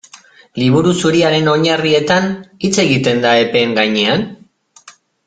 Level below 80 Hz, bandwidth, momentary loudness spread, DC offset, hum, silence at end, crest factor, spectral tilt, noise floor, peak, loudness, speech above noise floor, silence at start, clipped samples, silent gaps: -52 dBFS; 9.4 kHz; 7 LU; under 0.1%; none; 0.35 s; 14 dB; -5 dB/octave; -44 dBFS; 0 dBFS; -13 LUFS; 31 dB; 0.55 s; under 0.1%; none